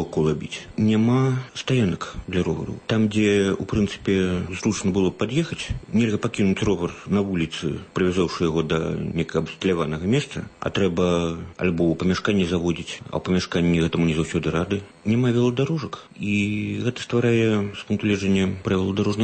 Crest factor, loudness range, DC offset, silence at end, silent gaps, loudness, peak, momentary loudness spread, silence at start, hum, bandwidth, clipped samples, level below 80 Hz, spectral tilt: 14 dB; 1 LU; under 0.1%; 0 s; none; -23 LUFS; -8 dBFS; 8 LU; 0 s; none; 8.8 kHz; under 0.1%; -44 dBFS; -6.5 dB/octave